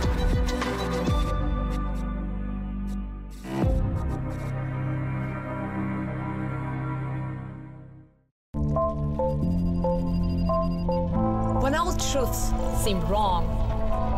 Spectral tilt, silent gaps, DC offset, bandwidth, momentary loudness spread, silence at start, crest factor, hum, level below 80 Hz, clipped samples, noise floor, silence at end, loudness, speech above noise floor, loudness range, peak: -6 dB/octave; 8.31-8.53 s; under 0.1%; 16 kHz; 8 LU; 0 s; 12 dB; none; -32 dBFS; under 0.1%; -49 dBFS; 0 s; -28 LUFS; 25 dB; 6 LU; -14 dBFS